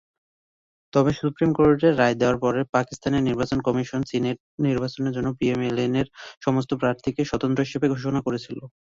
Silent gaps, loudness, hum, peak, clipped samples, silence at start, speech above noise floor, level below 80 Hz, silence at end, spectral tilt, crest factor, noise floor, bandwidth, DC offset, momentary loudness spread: 2.69-2.73 s, 4.40-4.58 s, 6.37-6.41 s; -23 LUFS; none; -6 dBFS; under 0.1%; 0.95 s; over 67 dB; -50 dBFS; 0.25 s; -7 dB/octave; 18 dB; under -90 dBFS; 7.6 kHz; under 0.1%; 7 LU